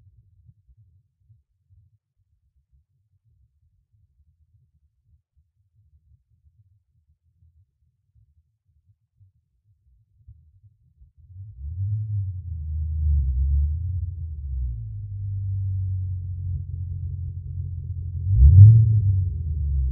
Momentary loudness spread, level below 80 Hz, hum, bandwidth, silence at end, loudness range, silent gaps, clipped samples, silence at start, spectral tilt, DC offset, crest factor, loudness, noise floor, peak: 18 LU; -30 dBFS; none; 0.5 kHz; 0 s; 16 LU; none; under 0.1%; 10.3 s; -19 dB/octave; under 0.1%; 24 dB; -22 LUFS; -69 dBFS; 0 dBFS